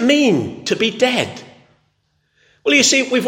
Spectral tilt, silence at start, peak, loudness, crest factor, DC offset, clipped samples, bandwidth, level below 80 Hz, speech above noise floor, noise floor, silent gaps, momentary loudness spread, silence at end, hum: -2.5 dB/octave; 0 s; 0 dBFS; -15 LUFS; 18 dB; under 0.1%; under 0.1%; 16.5 kHz; -64 dBFS; 50 dB; -65 dBFS; none; 13 LU; 0 s; none